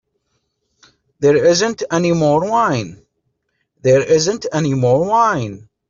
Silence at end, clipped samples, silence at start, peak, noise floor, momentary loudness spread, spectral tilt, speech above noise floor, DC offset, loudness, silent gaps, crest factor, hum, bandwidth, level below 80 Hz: 0.3 s; under 0.1%; 1.2 s; -2 dBFS; -70 dBFS; 9 LU; -5 dB/octave; 55 dB; under 0.1%; -15 LUFS; none; 14 dB; none; 7.6 kHz; -52 dBFS